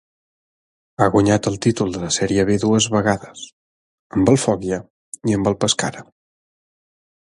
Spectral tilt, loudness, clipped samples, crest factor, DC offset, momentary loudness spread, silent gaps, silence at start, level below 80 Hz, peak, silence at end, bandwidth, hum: -4.5 dB/octave; -19 LUFS; under 0.1%; 20 dB; under 0.1%; 13 LU; 3.52-4.10 s, 4.90-5.12 s; 1 s; -46 dBFS; 0 dBFS; 1.4 s; 11.5 kHz; none